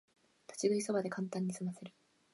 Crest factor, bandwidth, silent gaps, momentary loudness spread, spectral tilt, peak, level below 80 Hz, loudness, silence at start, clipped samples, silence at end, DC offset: 18 dB; 11.5 kHz; none; 17 LU; -5.5 dB/octave; -20 dBFS; -86 dBFS; -37 LUFS; 0.5 s; under 0.1%; 0.45 s; under 0.1%